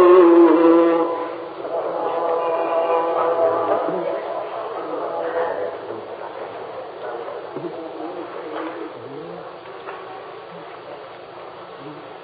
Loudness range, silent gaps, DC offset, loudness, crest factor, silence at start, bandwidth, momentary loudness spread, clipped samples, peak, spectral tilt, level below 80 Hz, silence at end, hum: 14 LU; none; under 0.1%; -20 LUFS; 18 dB; 0 s; 4.9 kHz; 22 LU; under 0.1%; -2 dBFS; -10.5 dB/octave; -72 dBFS; 0 s; none